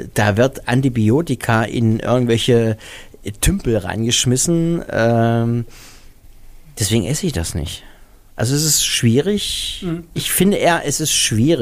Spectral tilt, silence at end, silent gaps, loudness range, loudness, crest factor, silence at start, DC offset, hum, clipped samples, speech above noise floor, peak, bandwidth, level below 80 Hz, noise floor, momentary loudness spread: -4.5 dB/octave; 0 s; none; 4 LU; -17 LUFS; 14 dB; 0 s; under 0.1%; none; under 0.1%; 26 dB; -2 dBFS; 15.5 kHz; -34 dBFS; -43 dBFS; 11 LU